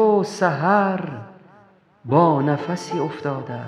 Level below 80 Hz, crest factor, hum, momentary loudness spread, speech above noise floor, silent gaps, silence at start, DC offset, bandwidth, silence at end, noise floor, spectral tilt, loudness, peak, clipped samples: -68 dBFS; 18 dB; none; 12 LU; 32 dB; none; 0 s; under 0.1%; 11.5 kHz; 0 s; -53 dBFS; -7 dB/octave; -20 LUFS; -2 dBFS; under 0.1%